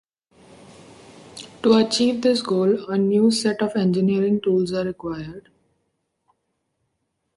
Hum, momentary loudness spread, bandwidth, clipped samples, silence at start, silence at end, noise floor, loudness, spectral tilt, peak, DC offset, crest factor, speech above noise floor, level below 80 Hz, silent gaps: none; 15 LU; 11.5 kHz; under 0.1%; 1.35 s; 1.95 s; -75 dBFS; -20 LUFS; -5.5 dB/octave; -6 dBFS; under 0.1%; 18 dB; 55 dB; -60 dBFS; none